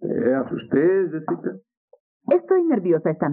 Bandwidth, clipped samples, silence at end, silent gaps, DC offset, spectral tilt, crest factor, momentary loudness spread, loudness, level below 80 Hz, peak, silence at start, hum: 3.1 kHz; under 0.1%; 0 s; 1.77-1.88 s, 2.00-2.20 s; under 0.1%; -8 dB/octave; 14 dB; 9 LU; -21 LUFS; -70 dBFS; -6 dBFS; 0 s; none